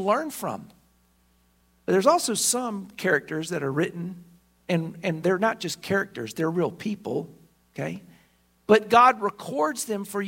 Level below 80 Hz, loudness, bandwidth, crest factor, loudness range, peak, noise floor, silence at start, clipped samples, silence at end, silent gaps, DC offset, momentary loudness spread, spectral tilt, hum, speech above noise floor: -66 dBFS; -25 LUFS; 16.5 kHz; 22 dB; 4 LU; -4 dBFS; -64 dBFS; 0 s; under 0.1%; 0 s; none; under 0.1%; 17 LU; -4 dB/octave; none; 39 dB